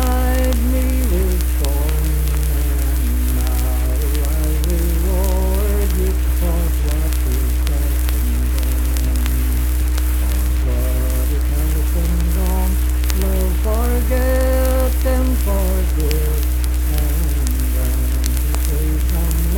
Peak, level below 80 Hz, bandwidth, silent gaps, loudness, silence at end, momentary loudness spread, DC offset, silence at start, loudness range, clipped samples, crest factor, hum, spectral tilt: 0 dBFS; -16 dBFS; 18.5 kHz; none; -19 LUFS; 0 s; 2 LU; under 0.1%; 0 s; 1 LU; under 0.1%; 16 dB; none; -6 dB/octave